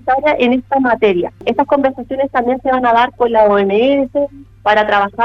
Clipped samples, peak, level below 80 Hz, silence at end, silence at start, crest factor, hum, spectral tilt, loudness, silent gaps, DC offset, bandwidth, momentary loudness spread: under 0.1%; 0 dBFS; -46 dBFS; 0 s; 0.05 s; 14 dB; none; -7 dB/octave; -14 LUFS; none; under 0.1%; 7 kHz; 7 LU